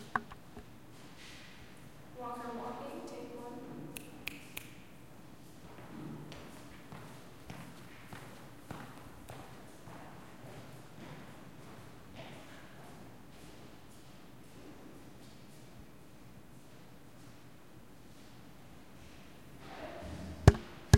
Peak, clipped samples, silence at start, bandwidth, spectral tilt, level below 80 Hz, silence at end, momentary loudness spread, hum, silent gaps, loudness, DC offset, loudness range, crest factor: -4 dBFS; under 0.1%; 0 s; 16.5 kHz; -6 dB/octave; -50 dBFS; 0 s; 12 LU; none; none; -42 LUFS; 0.2%; 10 LU; 36 dB